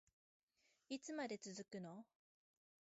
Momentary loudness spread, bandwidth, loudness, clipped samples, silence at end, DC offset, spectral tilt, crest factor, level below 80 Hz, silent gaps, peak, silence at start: 12 LU; 7.6 kHz; -51 LUFS; under 0.1%; 0.95 s; under 0.1%; -4 dB/octave; 20 dB; under -90 dBFS; none; -34 dBFS; 0.9 s